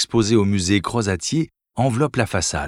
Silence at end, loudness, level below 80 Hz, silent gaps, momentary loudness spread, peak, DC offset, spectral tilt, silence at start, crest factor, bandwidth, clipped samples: 0 s; -20 LUFS; -44 dBFS; none; 6 LU; -4 dBFS; under 0.1%; -5 dB/octave; 0 s; 16 dB; 14.5 kHz; under 0.1%